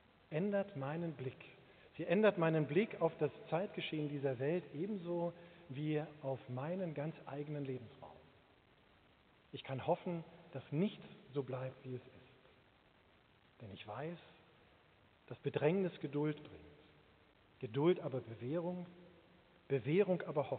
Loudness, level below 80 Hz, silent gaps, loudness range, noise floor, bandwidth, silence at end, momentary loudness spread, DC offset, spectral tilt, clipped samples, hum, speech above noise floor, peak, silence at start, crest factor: -40 LUFS; -80 dBFS; none; 11 LU; -69 dBFS; 4.5 kHz; 0 s; 18 LU; under 0.1%; -6.5 dB/octave; under 0.1%; none; 30 dB; -18 dBFS; 0.3 s; 22 dB